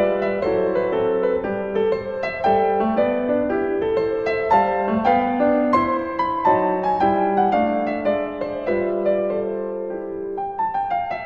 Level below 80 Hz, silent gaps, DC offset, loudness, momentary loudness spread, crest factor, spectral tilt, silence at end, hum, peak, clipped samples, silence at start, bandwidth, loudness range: -50 dBFS; none; under 0.1%; -21 LUFS; 8 LU; 16 dB; -8 dB/octave; 0 s; none; -4 dBFS; under 0.1%; 0 s; 7 kHz; 3 LU